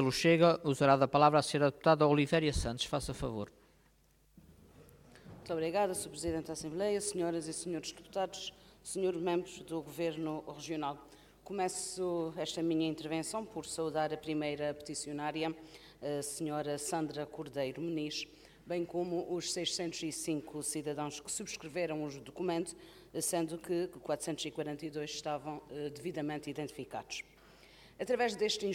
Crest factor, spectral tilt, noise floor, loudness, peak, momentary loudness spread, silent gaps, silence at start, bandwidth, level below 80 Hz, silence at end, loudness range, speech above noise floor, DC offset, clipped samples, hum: 24 dB; -4.5 dB/octave; -68 dBFS; -35 LUFS; -12 dBFS; 14 LU; none; 0 s; 16.5 kHz; -58 dBFS; 0 s; 7 LU; 33 dB; under 0.1%; under 0.1%; none